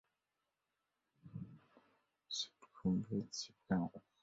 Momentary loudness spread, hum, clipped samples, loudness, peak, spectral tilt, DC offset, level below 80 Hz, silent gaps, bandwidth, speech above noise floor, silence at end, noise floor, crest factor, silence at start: 14 LU; none; under 0.1%; -43 LUFS; -24 dBFS; -5.5 dB/octave; under 0.1%; -70 dBFS; none; 7.6 kHz; 49 dB; 0.25 s; -89 dBFS; 22 dB; 1.25 s